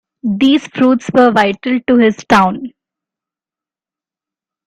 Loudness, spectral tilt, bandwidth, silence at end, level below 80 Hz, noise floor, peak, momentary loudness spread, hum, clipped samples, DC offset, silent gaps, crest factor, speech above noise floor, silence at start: -12 LUFS; -6 dB/octave; 10.5 kHz; 2 s; -50 dBFS; -89 dBFS; 0 dBFS; 8 LU; none; under 0.1%; under 0.1%; none; 14 dB; 78 dB; 0.25 s